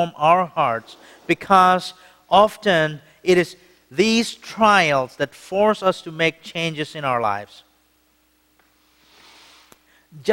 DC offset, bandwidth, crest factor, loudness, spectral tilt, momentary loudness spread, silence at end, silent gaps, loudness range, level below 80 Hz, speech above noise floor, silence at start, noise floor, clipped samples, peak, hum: under 0.1%; 16.5 kHz; 20 dB; -19 LUFS; -4.5 dB/octave; 13 LU; 0 s; none; 10 LU; -60 dBFS; 42 dB; 0 s; -62 dBFS; under 0.1%; 0 dBFS; none